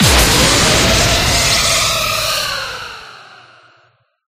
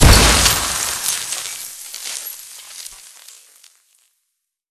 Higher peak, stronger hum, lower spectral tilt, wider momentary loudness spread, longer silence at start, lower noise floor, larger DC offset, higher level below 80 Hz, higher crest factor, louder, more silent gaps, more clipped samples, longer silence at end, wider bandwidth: about the same, 0 dBFS vs 0 dBFS; neither; about the same, -2.5 dB/octave vs -2.5 dB/octave; second, 15 LU vs 23 LU; about the same, 0 s vs 0 s; second, -55 dBFS vs -75 dBFS; neither; about the same, -26 dBFS vs -24 dBFS; about the same, 14 dB vs 18 dB; first, -11 LUFS vs -16 LUFS; neither; neither; second, 1.15 s vs 1.75 s; about the same, 16 kHz vs 16 kHz